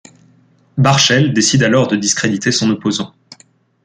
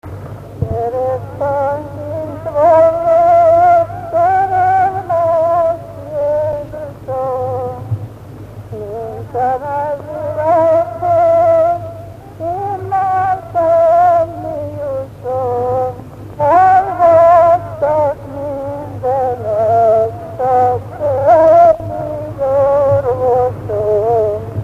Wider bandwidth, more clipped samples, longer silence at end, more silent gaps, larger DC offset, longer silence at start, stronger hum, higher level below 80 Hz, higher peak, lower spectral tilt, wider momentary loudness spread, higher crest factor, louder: first, 9.6 kHz vs 7.4 kHz; neither; first, 0.8 s vs 0 s; neither; neither; first, 0.75 s vs 0.05 s; second, none vs 50 Hz at -40 dBFS; second, -52 dBFS vs -42 dBFS; about the same, 0 dBFS vs 0 dBFS; second, -4 dB/octave vs -8 dB/octave; second, 10 LU vs 15 LU; about the same, 16 dB vs 14 dB; about the same, -13 LUFS vs -14 LUFS